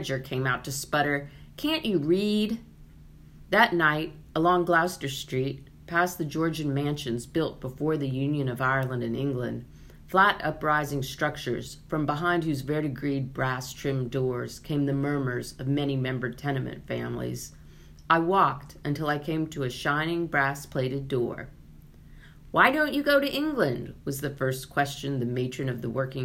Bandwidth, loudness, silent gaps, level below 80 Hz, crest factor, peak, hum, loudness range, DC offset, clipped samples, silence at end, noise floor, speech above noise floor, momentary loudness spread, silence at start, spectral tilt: 16 kHz; -27 LUFS; none; -52 dBFS; 24 dB; -4 dBFS; none; 4 LU; under 0.1%; under 0.1%; 0 s; -50 dBFS; 22 dB; 11 LU; 0 s; -5.5 dB/octave